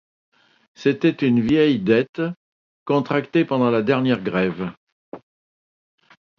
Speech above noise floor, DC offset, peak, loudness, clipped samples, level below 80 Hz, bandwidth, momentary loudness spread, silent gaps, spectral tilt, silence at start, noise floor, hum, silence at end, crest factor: over 71 dB; under 0.1%; -4 dBFS; -20 LUFS; under 0.1%; -58 dBFS; 7 kHz; 11 LU; 2.09-2.13 s, 2.36-2.86 s, 4.77-5.12 s; -8 dB/octave; 0.8 s; under -90 dBFS; none; 1.2 s; 18 dB